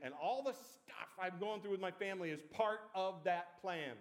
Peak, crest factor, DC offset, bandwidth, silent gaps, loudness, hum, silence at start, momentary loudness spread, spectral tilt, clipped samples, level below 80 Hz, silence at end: -24 dBFS; 20 dB; under 0.1%; 16.5 kHz; none; -42 LUFS; none; 0 s; 8 LU; -5 dB/octave; under 0.1%; under -90 dBFS; 0 s